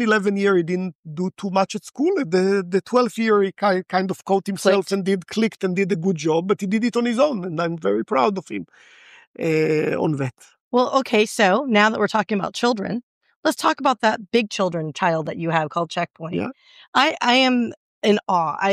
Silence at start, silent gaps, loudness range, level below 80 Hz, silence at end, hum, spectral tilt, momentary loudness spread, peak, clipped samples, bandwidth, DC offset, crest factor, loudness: 0 s; 0.95-1.03 s, 9.27-9.34 s, 10.60-10.71 s, 13.03-13.21 s, 13.36-13.43 s, 16.88-16.93 s, 17.77-18.02 s; 3 LU; -70 dBFS; 0 s; none; -5 dB/octave; 9 LU; -4 dBFS; under 0.1%; 14.5 kHz; under 0.1%; 18 dB; -21 LUFS